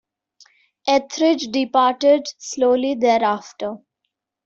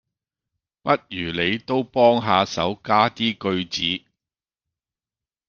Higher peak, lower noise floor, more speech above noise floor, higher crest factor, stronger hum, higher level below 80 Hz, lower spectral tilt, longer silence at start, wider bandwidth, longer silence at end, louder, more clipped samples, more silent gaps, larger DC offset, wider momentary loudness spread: about the same, -4 dBFS vs -2 dBFS; second, -78 dBFS vs under -90 dBFS; second, 60 dB vs over 69 dB; about the same, 16 dB vs 20 dB; neither; second, -66 dBFS vs -60 dBFS; second, -3 dB/octave vs -5 dB/octave; about the same, 0.85 s vs 0.85 s; first, 8 kHz vs 7.2 kHz; second, 0.7 s vs 1.5 s; about the same, -19 LUFS vs -21 LUFS; neither; neither; neither; first, 13 LU vs 8 LU